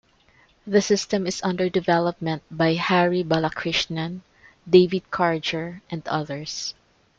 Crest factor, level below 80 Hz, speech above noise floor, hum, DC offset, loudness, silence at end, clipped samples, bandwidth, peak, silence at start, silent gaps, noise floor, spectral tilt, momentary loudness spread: 20 dB; -58 dBFS; 36 dB; none; under 0.1%; -23 LUFS; 0.45 s; under 0.1%; 7.8 kHz; -4 dBFS; 0.65 s; none; -58 dBFS; -5 dB/octave; 12 LU